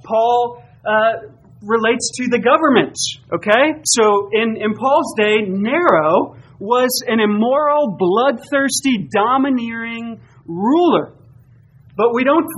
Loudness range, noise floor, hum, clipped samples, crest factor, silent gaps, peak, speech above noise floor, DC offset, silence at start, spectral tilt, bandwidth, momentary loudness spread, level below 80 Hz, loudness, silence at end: 3 LU; -47 dBFS; none; under 0.1%; 16 dB; none; 0 dBFS; 31 dB; under 0.1%; 0.05 s; -3.5 dB/octave; 12.5 kHz; 12 LU; -58 dBFS; -16 LUFS; 0 s